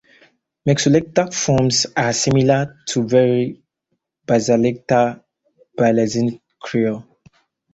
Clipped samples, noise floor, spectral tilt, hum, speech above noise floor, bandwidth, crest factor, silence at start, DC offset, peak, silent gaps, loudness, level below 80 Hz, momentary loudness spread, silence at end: under 0.1%; -74 dBFS; -5 dB/octave; none; 57 dB; 8.2 kHz; 18 dB; 0.65 s; under 0.1%; -2 dBFS; none; -18 LUFS; -52 dBFS; 9 LU; 0.7 s